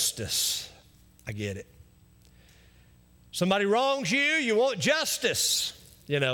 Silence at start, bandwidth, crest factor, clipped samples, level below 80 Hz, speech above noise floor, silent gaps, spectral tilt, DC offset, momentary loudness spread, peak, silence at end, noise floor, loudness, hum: 0 s; 18 kHz; 18 dB; under 0.1%; -62 dBFS; 31 dB; none; -2.5 dB/octave; under 0.1%; 14 LU; -12 dBFS; 0 s; -58 dBFS; -26 LUFS; 60 Hz at -55 dBFS